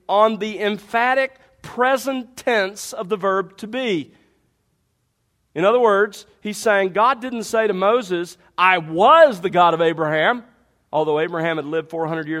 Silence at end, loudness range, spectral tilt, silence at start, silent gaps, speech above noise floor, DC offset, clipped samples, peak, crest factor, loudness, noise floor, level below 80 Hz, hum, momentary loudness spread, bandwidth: 0 s; 7 LU; -4.5 dB/octave; 0.1 s; none; 50 dB; under 0.1%; under 0.1%; 0 dBFS; 18 dB; -19 LUFS; -69 dBFS; -64 dBFS; none; 11 LU; 15.5 kHz